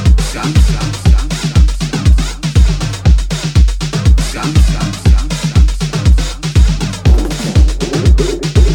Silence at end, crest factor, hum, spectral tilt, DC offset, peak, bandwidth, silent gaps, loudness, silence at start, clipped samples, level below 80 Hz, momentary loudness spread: 0 s; 10 dB; none; -5.5 dB/octave; under 0.1%; 0 dBFS; 12.5 kHz; none; -13 LUFS; 0 s; under 0.1%; -12 dBFS; 2 LU